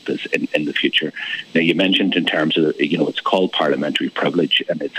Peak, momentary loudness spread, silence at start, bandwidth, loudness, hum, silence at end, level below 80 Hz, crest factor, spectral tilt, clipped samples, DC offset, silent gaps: -2 dBFS; 5 LU; 0.05 s; 13.5 kHz; -18 LUFS; none; 0 s; -72 dBFS; 18 dB; -5.5 dB/octave; under 0.1%; under 0.1%; none